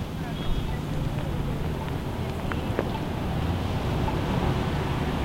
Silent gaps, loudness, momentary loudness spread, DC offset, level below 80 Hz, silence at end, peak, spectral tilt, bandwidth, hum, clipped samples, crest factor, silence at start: none; -29 LUFS; 4 LU; under 0.1%; -34 dBFS; 0 s; -8 dBFS; -7 dB/octave; 16 kHz; none; under 0.1%; 18 dB; 0 s